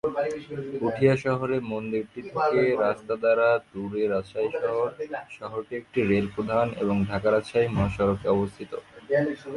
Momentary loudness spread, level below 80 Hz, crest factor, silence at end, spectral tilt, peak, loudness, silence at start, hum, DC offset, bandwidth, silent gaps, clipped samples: 12 LU; -50 dBFS; 20 dB; 0 s; -7.5 dB/octave; -6 dBFS; -26 LUFS; 0.05 s; none; under 0.1%; 11.5 kHz; none; under 0.1%